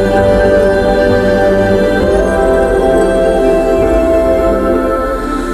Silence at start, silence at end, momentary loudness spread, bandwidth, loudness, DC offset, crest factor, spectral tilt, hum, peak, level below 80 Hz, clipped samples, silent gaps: 0 s; 0 s; 3 LU; 14.5 kHz; -11 LUFS; under 0.1%; 10 dB; -6.5 dB/octave; none; 0 dBFS; -22 dBFS; under 0.1%; none